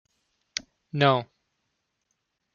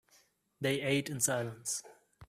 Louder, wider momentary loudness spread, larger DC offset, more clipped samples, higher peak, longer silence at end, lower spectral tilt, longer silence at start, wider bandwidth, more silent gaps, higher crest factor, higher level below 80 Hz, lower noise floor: first, -26 LUFS vs -34 LUFS; first, 14 LU vs 7 LU; neither; neither; first, -6 dBFS vs -16 dBFS; first, 1.3 s vs 0.05 s; first, -5 dB/octave vs -3.5 dB/octave; first, 0.95 s vs 0.6 s; second, 7.2 kHz vs 16 kHz; neither; first, 26 dB vs 20 dB; about the same, -72 dBFS vs -70 dBFS; first, -78 dBFS vs -69 dBFS